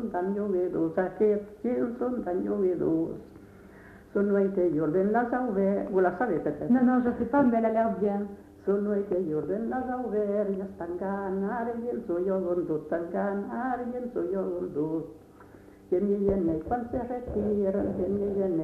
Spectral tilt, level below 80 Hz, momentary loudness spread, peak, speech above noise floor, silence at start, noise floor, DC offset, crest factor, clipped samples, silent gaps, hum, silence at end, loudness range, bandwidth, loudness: -10 dB/octave; -54 dBFS; 7 LU; -12 dBFS; 23 dB; 0 s; -51 dBFS; under 0.1%; 16 dB; under 0.1%; none; none; 0 s; 5 LU; 4.6 kHz; -28 LUFS